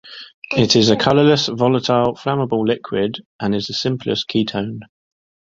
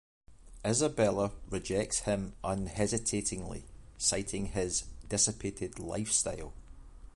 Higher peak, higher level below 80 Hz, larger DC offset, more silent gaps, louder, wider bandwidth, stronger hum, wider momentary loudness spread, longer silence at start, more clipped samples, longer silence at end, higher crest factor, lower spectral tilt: first, -2 dBFS vs -14 dBFS; about the same, -52 dBFS vs -50 dBFS; neither; first, 0.34-0.42 s, 3.25-3.39 s vs none; first, -17 LUFS vs -32 LUFS; second, 7.8 kHz vs 11.5 kHz; neither; about the same, 12 LU vs 10 LU; second, 0.05 s vs 0.3 s; neither; first, 0.65 s vs 0.05 s; about the same, 18 dB vs 20 dB; first, -5 dB/octave vs -3.5 dB/octave